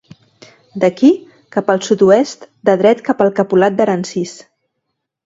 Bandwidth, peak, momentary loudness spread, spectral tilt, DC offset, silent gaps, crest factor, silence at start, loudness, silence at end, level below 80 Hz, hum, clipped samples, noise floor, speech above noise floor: 8 kHz; 0 dBFS; 11 LU; -6 dB/octave; under 0.1%; none; 14 dB; 0.75 s; -14 LUFS; 0.9 s; -60 dBFS; none; under 0.1%; -74 dBFS; 61 dB